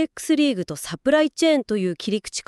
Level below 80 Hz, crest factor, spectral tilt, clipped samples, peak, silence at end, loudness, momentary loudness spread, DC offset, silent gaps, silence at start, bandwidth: -58 dBFS; 16 dB; -4.5 dB/octave; under 0.1%; -4 dBFS; 0.05 s; -22 LUFS; 7 LU; under 0.1%; none; 0 s; 13.5 kHz